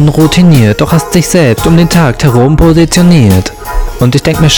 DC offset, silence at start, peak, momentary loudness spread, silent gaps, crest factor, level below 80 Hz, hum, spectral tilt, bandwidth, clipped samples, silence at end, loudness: under 0.1%; 0 s; 0 dBFS; 6 LU; none; 6 dB; -20 dBFS; none; -5.5 dB/octave; over 20 kHz; 10%; 0 s; -6 LUFS